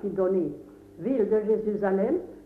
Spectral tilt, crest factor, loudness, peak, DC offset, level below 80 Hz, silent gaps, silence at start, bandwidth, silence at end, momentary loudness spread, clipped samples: -10 dB/octave; 14 dB; -26 LUFS; -14 dBFS; under 0.1%; -60 dBFS; none; 0 s; 3.7 kHz; 0 s; 10 LU; under 0.1%